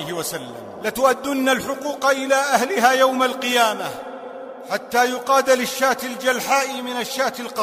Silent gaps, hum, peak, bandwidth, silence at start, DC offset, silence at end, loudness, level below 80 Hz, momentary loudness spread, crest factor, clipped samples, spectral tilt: none; none; 0 dBFS; 16 kHz; 0 s; under 0.1%; 0 s; -20 LUFS; -62 dBFS; 13 LU; 20 dB; under 0.1%; -2 dB/octave